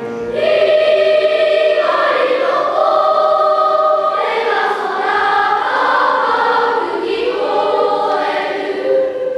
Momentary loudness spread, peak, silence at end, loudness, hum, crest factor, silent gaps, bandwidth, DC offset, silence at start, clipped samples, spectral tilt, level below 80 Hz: 6 LU; 0 dBFS; 0 s; -14 LUFS; none; 14 dB; none; 10.5 kHz; under 0.1%; 0 s; under 0.1%; -4 dB/octave; -58 dBFS